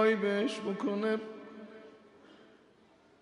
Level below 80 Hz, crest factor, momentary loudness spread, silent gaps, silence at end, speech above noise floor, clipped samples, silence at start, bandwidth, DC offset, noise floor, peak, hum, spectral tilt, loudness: -84 dBFS; 18 dB; 22 LU; none; 0.9 s; 32 dB; under 0.1%; 0 s; 11 kHz; under 0.1%; -63 dBFS; -16 dBFS; none; -6 dB/octave; -32 LUFS